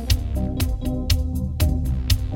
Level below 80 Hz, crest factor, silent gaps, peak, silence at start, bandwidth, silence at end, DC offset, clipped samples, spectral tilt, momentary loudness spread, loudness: -24 dBFS; 16 dB; none; -4 dBFS; 0 s; 18 kHz; 0 s; under 0.1%; under 0.1%; -5.5 dB/octave; 4 LU; -24 LUFS